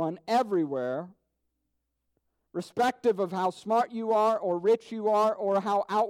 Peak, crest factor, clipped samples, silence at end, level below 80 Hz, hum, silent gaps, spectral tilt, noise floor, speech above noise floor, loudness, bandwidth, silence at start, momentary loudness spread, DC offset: -14 dBFS; 14 dB; under 0.1%; 0 s; -78 dBFS; none; none; -6 dB/octave; -80 dBFS; 53 dB; -27 LUFS; 15.5 kHz; 0 s; 9 LU; under 0.1%